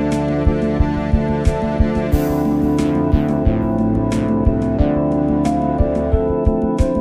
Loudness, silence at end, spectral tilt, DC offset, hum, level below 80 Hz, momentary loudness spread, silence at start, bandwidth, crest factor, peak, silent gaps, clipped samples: -17 LUFS; 0 s; -8.5 dB/octave; under 0.1%; none; -22 dBFS; 1 LU; 0 s; 15.5 kHz; 14 dB; -2 dBFS; none; under 0.1%